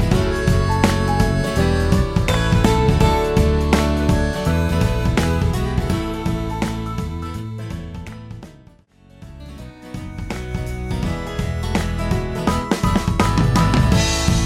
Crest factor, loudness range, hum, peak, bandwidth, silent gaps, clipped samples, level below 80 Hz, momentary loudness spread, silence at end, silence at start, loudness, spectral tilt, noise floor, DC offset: 18 dB; 14 LU; none; -2 dBFS; 16 kHz; none; under 0.1%; -26 dBFS; 16 LU; 0 s; 0 s; -19 LUFS; -6 dB/octave; -49 dBFS; under 0.1%